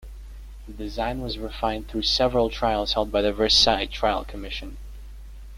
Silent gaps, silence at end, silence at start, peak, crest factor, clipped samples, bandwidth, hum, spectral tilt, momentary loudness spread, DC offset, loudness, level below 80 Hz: none; 0 s; 0 s; -4 dBFS; 20 dB; under 0.1%; 15.5 kHz; none; -3.5 dB/octave; 26 LU; under 0.1%; -23 LUFS; -36 dBFS